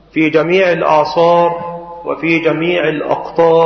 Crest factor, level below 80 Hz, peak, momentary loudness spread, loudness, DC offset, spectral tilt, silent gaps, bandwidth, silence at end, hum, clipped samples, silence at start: 12 dB; -50 dBFS; 0 dBFS; 11 LU; -13 LUFS; under 0.1%; -6.5 dB/octave; none; 6.4 kHz; 0 s; none; under 0.1%; 0.15 s